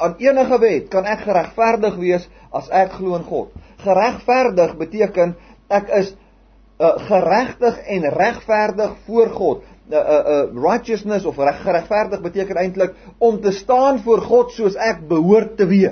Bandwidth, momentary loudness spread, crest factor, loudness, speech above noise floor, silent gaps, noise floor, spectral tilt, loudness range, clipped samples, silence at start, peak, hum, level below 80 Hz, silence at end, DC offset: 6.6 kHz; 8 LU; 16 dB; -17 LUFS; 33 dB; none; -49 dBFS; -6.5 dB/octave; 2 LU; under 0.1%; 0 s; -2 dBFS; none; -48 dBFS; 0 s; under 0.1%